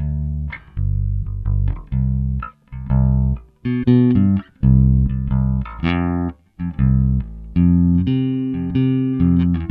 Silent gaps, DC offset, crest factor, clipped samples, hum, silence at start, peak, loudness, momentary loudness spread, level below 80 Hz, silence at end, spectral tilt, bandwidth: none; under 0.1%; 14 dB; under 0.1%; none; 0 s; -2 dBFS; -19 LUFS; 11 LU; -24 dBFS; 0 s; -11.5 dB/octave; 4.4 kHz